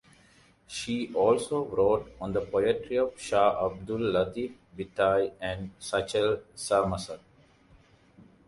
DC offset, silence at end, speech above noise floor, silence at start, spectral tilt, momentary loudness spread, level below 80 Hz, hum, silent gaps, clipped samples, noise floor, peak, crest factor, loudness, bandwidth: under 0.1%; 0.25 s; 32 dB; 0.7 s; -5 dB/octave; 12 LU; -54 dBFS; none; none; under 0.1%; -60 dBFS; -10 dBFS; 18 dB; -28 LUFS; 11.5 kHz